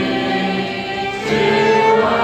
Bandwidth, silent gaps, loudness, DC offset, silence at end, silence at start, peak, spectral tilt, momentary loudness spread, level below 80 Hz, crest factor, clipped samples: 12.5 kHz; none; -16 LUFS; under 0.1%; 0 s; 0 s; -2 dBFS; -5 dB/octave; 9 LU; -48 dBFS; 14 dB; under 0.1%